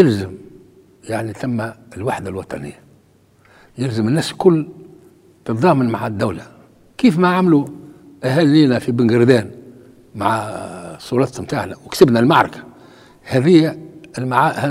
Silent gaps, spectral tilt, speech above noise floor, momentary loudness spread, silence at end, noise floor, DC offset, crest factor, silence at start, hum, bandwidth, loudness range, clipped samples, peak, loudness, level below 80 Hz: none; -7 dB/octave; 37 dB; 19 LU; 0 s; -53 dBFS; under 0.1%; 18 dB; 0 s; none; 15 kHz; 8 LU; under 0.1%; 0 dBFS; -17 LUFS; -54 dBFS